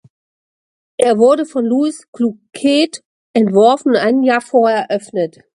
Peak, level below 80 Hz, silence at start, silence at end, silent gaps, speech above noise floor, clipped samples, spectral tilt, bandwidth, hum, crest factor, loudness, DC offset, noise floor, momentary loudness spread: 0 dBFS; -64 dBFS; 1 s; 0.3 s; 2.08-2.13 s, 3.05-3.34 s; over 76 dB; under 0.1%; -5 dB/octave; 11.5 kHz; none; 14 dB; -14 LUFS; under 0.1%; under -90 dBFS; 9 LU